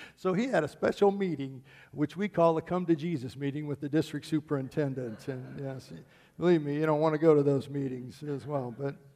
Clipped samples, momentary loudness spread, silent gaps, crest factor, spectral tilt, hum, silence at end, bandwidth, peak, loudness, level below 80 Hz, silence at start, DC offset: under 0.1%; 14 LU; none; 18 dB; -7.5 dB/octave; none; 0.2 s; 14 kHz; -12 dBFS; -30 LUFS; -68 dBFS; 0 s; under 0.1%